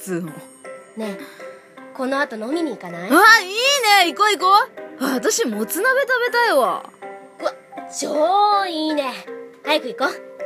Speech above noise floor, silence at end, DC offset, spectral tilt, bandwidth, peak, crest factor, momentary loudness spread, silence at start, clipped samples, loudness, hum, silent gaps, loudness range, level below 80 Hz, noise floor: 22 dB; 0 s; under 0.1%; -2 dB/octave; 15.5 kHz; 0 dBFS; 18 dB; 23 LU; 0 s; under 0.1%; -18 LUFS; none; none; 6 LU; -80 dBFS; -40 dBFS